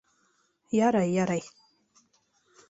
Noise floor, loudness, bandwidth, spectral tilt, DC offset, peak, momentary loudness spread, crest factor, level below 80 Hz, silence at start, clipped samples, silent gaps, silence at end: -70 dBFS; -27 LUFS; 8 kHz; -6.5 dB/octave; under 0.1%; -10 dBFS; 10 LU; 20 dB; -68 dBFS; 0.7 s; under 0.1%; none; 1.2 s